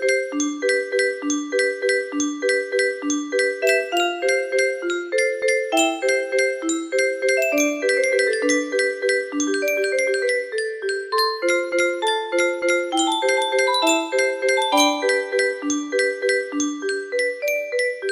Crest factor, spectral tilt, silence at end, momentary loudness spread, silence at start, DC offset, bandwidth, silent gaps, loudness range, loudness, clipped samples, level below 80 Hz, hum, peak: 16 dB; 0 dB/octave; 0 s; 5 LU; 0 s; under 0.1%; 15.5 kHz; none; 2 LU; -20 LUFS; under 0.1%; -70 dBFS; none; -4 dBFS